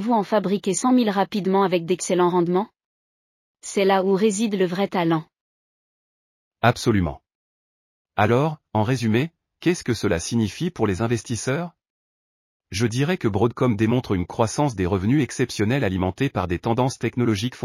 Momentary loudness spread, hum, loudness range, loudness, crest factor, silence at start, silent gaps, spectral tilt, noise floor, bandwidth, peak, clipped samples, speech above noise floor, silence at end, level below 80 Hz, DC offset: 6 LU; none; 3 LU; -22 LUFS; 18 dB; 0 s; 2.85-3.54 s, 5.41-6.51 s, 7.35-8.05 s, 11.90-12.60 s; -6 dB/octave; under -90 dBFS; 15 kHz; -4 dBFS; under 0.1%; over 69 dB; 0 s; -50 dBFS; under 0.1%